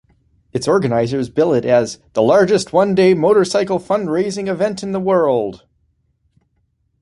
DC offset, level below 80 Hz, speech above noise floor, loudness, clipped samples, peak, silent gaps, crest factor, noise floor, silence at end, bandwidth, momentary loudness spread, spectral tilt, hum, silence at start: under 0.1%; -54 dBFS; 49 dB; -16 LUFS; under 0.1%; -2 dBFS; none; 14 dB; -65 dBFS; 1.45 s; 11.5 kHz; 8 LU; -6 dB/octave; none; 0.55 s